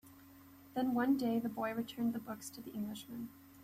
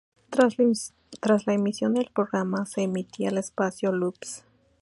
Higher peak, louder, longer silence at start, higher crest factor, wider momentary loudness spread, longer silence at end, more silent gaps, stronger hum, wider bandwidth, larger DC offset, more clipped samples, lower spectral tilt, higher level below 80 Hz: second, -22 dBFS vs -6 dBFS; second, -38 LUFS vs -26 LUFS; second, 0.05 s vs 0.3 s; about the same, 16 dB vs 20 dB; first, 24 LU vs 8 LU; second, 0 s vs 0.4 s; neither; neither; first, 15 kHz vs 11.5 kHz; neither; neither; about the same, -5.5 dB/octave vs -5.5 dB/octave; about the same, -76 dBFS vs -72 dBFS